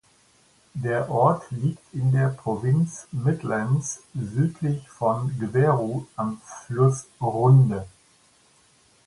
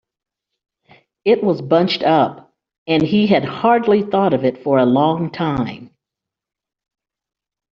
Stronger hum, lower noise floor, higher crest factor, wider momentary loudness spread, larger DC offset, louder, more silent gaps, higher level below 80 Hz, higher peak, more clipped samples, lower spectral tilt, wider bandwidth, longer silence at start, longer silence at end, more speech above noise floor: neither; second, -59 dBFS vs -85 dBFS; about the same, 18 dB vs 16 dB; first, 11 LU vs 7 LU; neither; second, -24 LUFS vs -16 LUFS; second, none vs 2.78-2.86 s; about the same, -56 dBFS vs -56 dBFS; second, -6 dBFS vs -2 dBFS; neither; first, -8 dB/octave vs -5 dB/octave; first, 11.5 kHz vs 6.8 kHz; second, 0.75 s vs 1.25 s; second, 1.2 s vs 1.9 s; second, 37 dB vs 69 dB